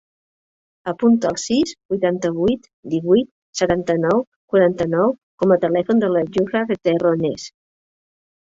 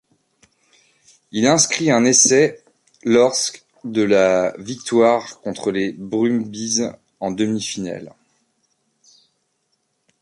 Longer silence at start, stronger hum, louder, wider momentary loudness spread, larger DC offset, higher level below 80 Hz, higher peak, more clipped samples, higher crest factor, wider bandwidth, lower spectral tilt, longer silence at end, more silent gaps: second, 0.85 s vs 1.35 s; neither; about the same, -19 LUFS vs -18 LUFS; second, 8 LU vs 15 LU; neither; first, -54 dBFS vs -60 dBFS; about the same, -2 dBFS vs -2 dBFS; neither; about the same, 16 dB vs 18 dB; second, 8 kHz vs 11.5 kHz; first, -6 dB/octave vs -3 dB/octave; second, 0.95 s vs 2.15 s; first, 1.85-1.89 s, 2.73-2.83 s, 3.31-3.53 s, 4.27-4.48 s, 5.23-5.38 s vs none